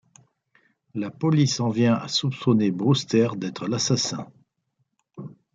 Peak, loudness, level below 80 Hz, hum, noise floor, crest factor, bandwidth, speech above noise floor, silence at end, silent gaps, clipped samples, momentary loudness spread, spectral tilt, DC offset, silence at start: -6 dBFS; -23 LUFS; -66 dBFS; none; -74 dBFS; 18 dB; 9.2 kHz; 51 dB; 0.25 s; none; under 0.1%; 16 LU; -5.5 dB/octave; under 0.1%; 0.95 s